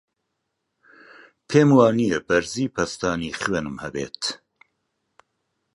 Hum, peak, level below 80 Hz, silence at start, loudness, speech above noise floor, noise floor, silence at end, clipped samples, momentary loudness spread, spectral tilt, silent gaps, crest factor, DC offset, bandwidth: none; -2 dBFS; -54 dBFS; 1.5 s; -22 LUFS; 57 dB; -78 dBFS; 1.4 s; under 0.1%; 14 LU; -5.5 dB/octave; none; 22 dB; under 0.1%; 11.5 kHz